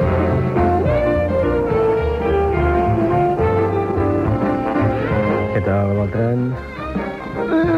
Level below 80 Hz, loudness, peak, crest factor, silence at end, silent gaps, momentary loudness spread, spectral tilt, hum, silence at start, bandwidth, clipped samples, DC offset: -30 dBFS; -18 LUFS; -6 dBFS; 12 dB; 0 s; none; 6 LU; -9.5 dB/octave; none; 0 s; 7.6 kHz; under 0.1%; under 0.1%